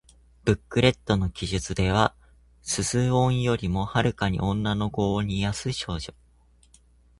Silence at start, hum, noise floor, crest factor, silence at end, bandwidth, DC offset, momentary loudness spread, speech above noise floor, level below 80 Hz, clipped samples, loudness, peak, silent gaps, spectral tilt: 0.45 s; none; -58 dBFS; 22 dB; 1.1 s; 11.5 kHz; under 0.1%; 8 LU; 34 dB; -42 dBFS; under 0.1%; -25 LUFS; -4 dBFS; none; -5 dB/octave